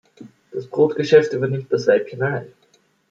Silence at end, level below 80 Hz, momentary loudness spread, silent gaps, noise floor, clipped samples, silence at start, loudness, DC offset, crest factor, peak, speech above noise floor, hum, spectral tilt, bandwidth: 0.65 s; -66 dBFS; 14 LU; none; -60 dBFS; under 0.1%; 0.2 s; -19 LUFS; under 0.1%; 18 dB; -2 dBFS; 42 dB; none; -6.5 dB/octave; 7.6 kHz